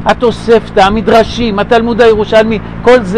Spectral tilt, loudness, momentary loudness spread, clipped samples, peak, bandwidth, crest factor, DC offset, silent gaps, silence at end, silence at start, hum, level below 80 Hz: -6 dB/octave; -9 LUFS; 5 LU; 0.2%; 0 dBFS; 12 kHz; 8 dB; 2%; none; 0 s; 0 s; none; -28 dBFS